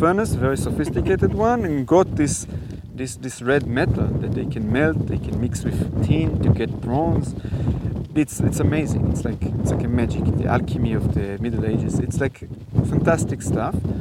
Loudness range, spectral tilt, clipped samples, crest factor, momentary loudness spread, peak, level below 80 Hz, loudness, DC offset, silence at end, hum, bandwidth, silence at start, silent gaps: 1 LU; -7 dB/octave; under 0.1%; 18 dB; 6 LU; -2 dBFS; -34 dBFS; -22 LUFS; under 0.1%; 0 s; none; 15.5 kHz; 0 s; none